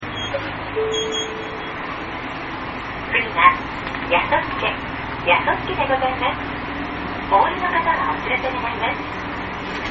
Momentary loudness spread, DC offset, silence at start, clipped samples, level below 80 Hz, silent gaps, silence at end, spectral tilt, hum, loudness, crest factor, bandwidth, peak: 11 LU; under 0.1%; 0 s; under 0.1%; -42 dBFS; none; 0 s; -2 dB/octave; none; -21 LUFS; 22 dB; 7.4 kHz; 0 dBFS